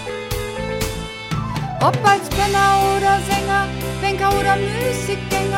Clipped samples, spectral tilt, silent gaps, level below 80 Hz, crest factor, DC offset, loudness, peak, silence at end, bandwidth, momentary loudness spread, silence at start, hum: under 0.1%; -4.5 dB/octave; none; -34 dBFS; 16 dB; under 0.1%; -19 LUFS; -2 dBFS; 0 s; 17 kHz; 10 LU; 0 s; none